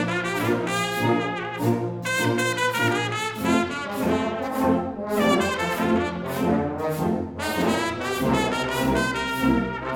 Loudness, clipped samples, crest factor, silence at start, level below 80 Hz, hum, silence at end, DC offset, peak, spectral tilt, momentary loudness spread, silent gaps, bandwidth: -24 LUFS; under 0.1%; 16 dB; 0 s; -46 dBFS; none; 0 s; under 0.1%; -8 dBFS; -5 dB/octave; 4 LU; none; 19.5 kHz